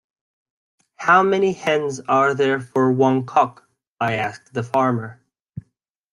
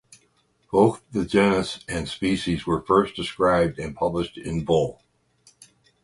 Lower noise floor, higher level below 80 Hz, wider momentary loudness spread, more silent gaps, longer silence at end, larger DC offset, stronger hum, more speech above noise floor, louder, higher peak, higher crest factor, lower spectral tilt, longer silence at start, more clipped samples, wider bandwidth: about the same, -67 dBFS vs -65 dBFS; second, -64 dBFS vs -46 dBFS; first, 17 LU vs 9 LU; first, 3.88-3.97 s, 5.40-5.44 s vs none; second, 0.5 s vs 1.1 s; neither; neither; first, 48 dB vs 43 dB; first, -19 LUFS vs -23 LUFS; about the same, -2 dBFS vs -4 dBFS; about the same, 18 dB vs 20 dB; about the same, -6 dB/octave vs -6 dB/octave; first, 1 s vs 0.7 s; neither; about the same, 11 kHz vs 11.5 kHz